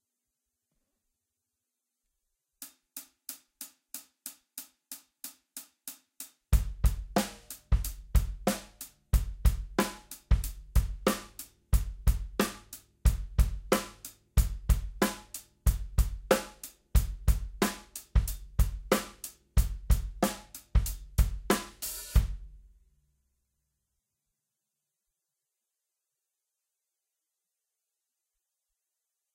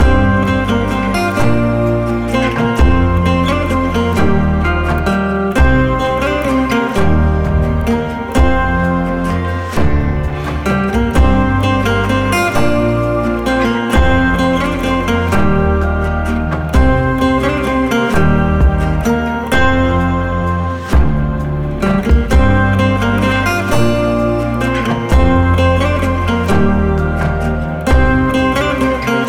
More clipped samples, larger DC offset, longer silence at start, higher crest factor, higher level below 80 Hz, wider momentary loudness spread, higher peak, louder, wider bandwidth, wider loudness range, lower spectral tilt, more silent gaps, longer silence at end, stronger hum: neither; neither; first, 2.6 s vs 0 s; first, 24 dB vs 10 dB; second, -34 dBFS vs -18 dBFS; first, 17 LU vs 4 LU; second, -8 dBFS vs -2 dBFS; second, -32 LUFS vs -14 LUFS; about the same, 16.5 kHz vs 15.5 kHz; first, 14 LU vs 1 LU; second, -5 dB/octave vs -7 dB/octave; neither; first, 6.8 s vs 0 s; neither